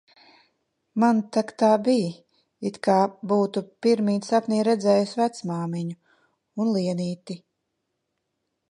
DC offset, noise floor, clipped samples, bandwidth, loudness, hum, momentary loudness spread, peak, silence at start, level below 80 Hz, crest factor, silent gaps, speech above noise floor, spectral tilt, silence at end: under 0.1%; -78 dBFS; under 0.1%; 11 kHz; -24 LUFS; none; 12 LU; -6 dBFS; 0.95 s; -76 dBFS; 18 dB; none; 56 dB; -6.5 dB/octave; 1.35 s